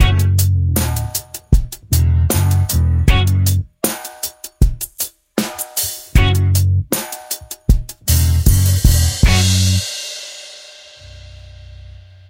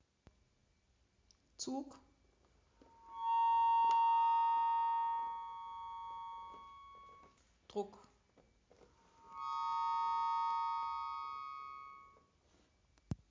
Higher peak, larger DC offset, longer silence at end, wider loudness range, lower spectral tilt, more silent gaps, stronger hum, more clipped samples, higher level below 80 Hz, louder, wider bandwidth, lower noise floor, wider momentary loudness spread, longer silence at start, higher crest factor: first, 0 dBFS vs -26 dBFS; neither; first, 0.4 s vs 0.15 s; second, 3 LU vs 16 LU; about the same, -4.5 dB/octave vs -4 dB/octave; neither; neither; neither; first, -20 dBFS vs -70 dBFS; first, -16 LUFS vs -37 LUFS; first, 17 kHz vs 7.6 kHz; second, -39 dBFS vs -75 dBFS; second, 12 LU vs 23 LU; second, 0 s vs 1.6 s; about the same, 16 dB vs 14 dB